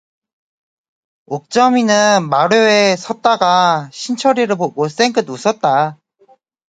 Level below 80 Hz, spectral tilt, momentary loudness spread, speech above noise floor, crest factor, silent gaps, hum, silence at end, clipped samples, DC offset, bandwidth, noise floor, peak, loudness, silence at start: -66 dBFS; -4 dB/octave; 8 LU; 39 dB; 16 dB; none; none; 0.75 s; under 0.1%; under 0.1%; 9.4 kHz; -52 dBFS; 0 dBFS; -14 LUFS; 1.3 s